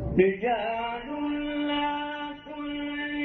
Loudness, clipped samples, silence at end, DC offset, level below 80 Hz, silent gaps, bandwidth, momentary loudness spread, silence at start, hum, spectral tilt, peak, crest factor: -29 LUFS; under 0.1%; 0 s; under 0.1%; -48 dBFS; none; 4.3 kHz; 11 LU; 0 s; none; -8.5 dB/octave; -8 dBFS; 20 dB